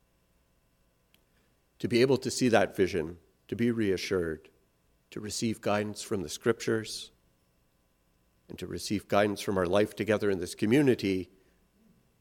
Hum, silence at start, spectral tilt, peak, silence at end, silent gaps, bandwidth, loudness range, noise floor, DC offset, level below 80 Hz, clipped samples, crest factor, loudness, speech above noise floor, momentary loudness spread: none; 1.8 s; -5 dB/octave; -8 dBFS; 0.95 s; none; 17.5 kHz; 5 LU; -70 dBFS; under 0.1%; -64 dBFS; under 0.1%; 22 dB; -29 LUFS; 41 dB; 15 LU